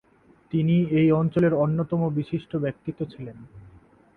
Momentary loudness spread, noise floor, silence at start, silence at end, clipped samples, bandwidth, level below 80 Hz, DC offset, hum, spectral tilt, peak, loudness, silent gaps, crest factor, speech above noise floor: 14 LU; -53 dBFS; 0.55 s; 0.5 s; under 0.1%; 4.4 kHz; -56 dBFS; under 0.1%; none; -10.5 dB/octave; -10 dBFS; -24 LUFS; none; 16 dB; 29 dB